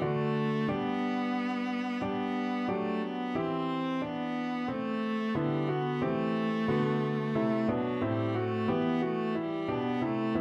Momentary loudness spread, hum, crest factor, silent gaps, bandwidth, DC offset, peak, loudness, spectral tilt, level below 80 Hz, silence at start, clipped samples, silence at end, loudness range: 4 LU; none; 12 dB; none; 7.6 kHz; under 0.1%; -18 dBFS; -31 LUFS; -8 dB/octave; -64 dBFS; 0 s; under 0.1%; 0 s; 2 LU